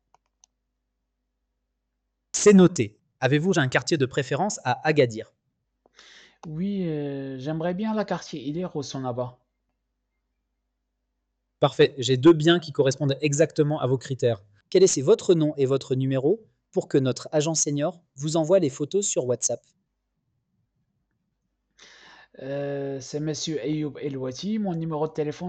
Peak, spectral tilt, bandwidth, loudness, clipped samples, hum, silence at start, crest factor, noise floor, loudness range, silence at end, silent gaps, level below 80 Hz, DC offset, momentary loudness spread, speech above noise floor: -6 dBFS; -5 dB/octave; 9.2 kHz; -24 LUFS; under 0.1%; none; 2.35 s; 18 dB; -79 dBFS; 11 LU; 0 s; none; -64 dBFS; under 0.1%; 12 LU; 55 dB